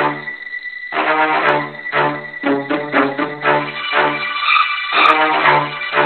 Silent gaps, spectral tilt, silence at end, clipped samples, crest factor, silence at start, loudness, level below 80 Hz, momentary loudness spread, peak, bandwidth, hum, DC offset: none; -6 dB/octave; 0 s; under 0.1%; 16 dB; 0 s; -16 LUFS; -68 dBFS; 10 LU; 0 dBFS; 9.6 kHz; none; 0.2%